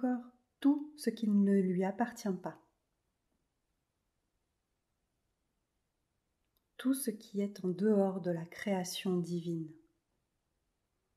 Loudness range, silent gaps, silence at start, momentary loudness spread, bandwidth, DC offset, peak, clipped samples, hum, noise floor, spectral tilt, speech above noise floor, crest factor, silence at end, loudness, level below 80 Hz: 10 LU; none; 0 s; 10 LU; 14.5 kHz; under 0.1%; -18 dBFS; under 0.1%; none; -84 dBFS; -6.5 dB/octave; 50 dB; 18 dB; 1.45 s; -35 LUFS; -82 dBFS